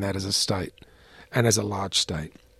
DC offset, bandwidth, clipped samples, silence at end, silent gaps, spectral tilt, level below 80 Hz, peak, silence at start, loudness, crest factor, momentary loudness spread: under 0.1%; 15 kHz; under 0.1%; 0.3 s; none; -3.5 dB/octave; -54 dBFS; -6 dBFS; 0 s; -25 LUFS; 20 dB; 9 LU